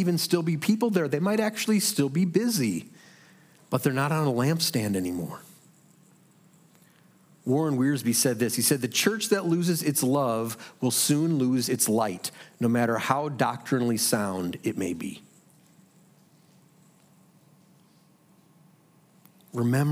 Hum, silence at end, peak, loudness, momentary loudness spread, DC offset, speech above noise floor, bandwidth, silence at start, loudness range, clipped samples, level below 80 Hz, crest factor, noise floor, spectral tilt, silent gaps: none; 0 s; -6 dBFS; -26 LUFS; 9 LU; under 0.1%; 34 dB; 16.5 kHz; 0 s; 8 LU; under 0.1%; -76 dBFS; 20 dB; -60 dBFS; -4.5 dB/octave; none